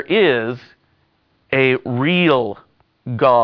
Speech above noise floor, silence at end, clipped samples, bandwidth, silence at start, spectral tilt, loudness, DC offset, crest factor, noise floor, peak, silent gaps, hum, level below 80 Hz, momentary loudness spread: 46 dB; 0 s; under 0.1%; 5.4 kHz; 0 s; -8.5 dB/octave; -17 LUFS; under 0.1%; 16 dB; -62 dBFS; -2 dBFS; none; none; -58 dBFS; 17 LU